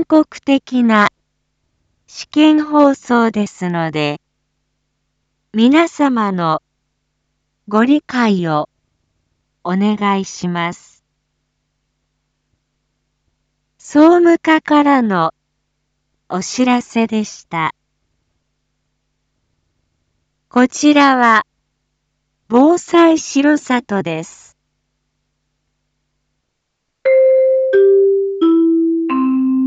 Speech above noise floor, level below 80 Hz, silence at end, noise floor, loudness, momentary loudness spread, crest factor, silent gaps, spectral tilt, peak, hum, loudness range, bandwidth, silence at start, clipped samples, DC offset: 59 dB; -62 dBFS; 0 s; -72 dBFS; -14 LUFS; 11 LU; 16 dB; none; -5.5 dB/octave; 0 dBFS; none; 10 LU; 8 kHz; 0 s; under 0.1%; under 0.1%